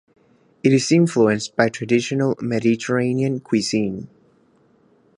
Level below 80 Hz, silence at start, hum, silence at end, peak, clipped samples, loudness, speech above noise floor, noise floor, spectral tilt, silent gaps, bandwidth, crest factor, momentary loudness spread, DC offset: -60 dBFS; 0.65 s; none; 1.1 s; -2 dBFS; under 0.1%; -19 LUFS; 39 dB; -57 dBFS; -5.5 dB/octave; none; 11.5 kHz; 20 dB; 7 LU; under 0.1%